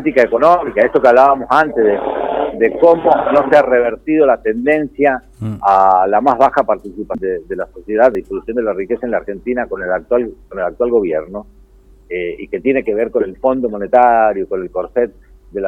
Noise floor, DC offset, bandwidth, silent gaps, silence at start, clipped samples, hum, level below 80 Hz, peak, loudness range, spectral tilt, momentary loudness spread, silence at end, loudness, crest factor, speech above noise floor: -44 dBFS; under 0.1%; 8.6 kHz; none; 0 s; under 0.1%; none; -44 dBFS; 0 dBFS; 7 LU; -7.5 dB/octave; 12 LU; 0 s; -14 LUFS; 14 dB; 30 dB